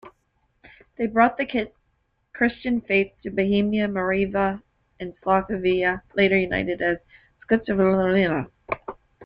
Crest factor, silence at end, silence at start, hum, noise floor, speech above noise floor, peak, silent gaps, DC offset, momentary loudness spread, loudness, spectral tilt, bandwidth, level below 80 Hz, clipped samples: 20 dB; 0 s; 0.05 s; none; -70 dBFS; 48 dB; -4 dBFS; none; under 0.1%; 12 LU; -23 LUFS; -9 dB/octave; 5.4 kHz; -50 dBFS; under 0.1%